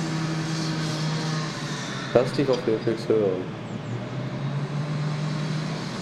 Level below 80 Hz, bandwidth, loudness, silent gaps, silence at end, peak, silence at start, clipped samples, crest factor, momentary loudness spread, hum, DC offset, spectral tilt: -58 dBFS; 12 kHz; -27 LUFS; none; 0 s; -6 dBFS; 0 s; under 0.1%; 20 dB; 8 LU; none; under 0.1%; -6 dB/octave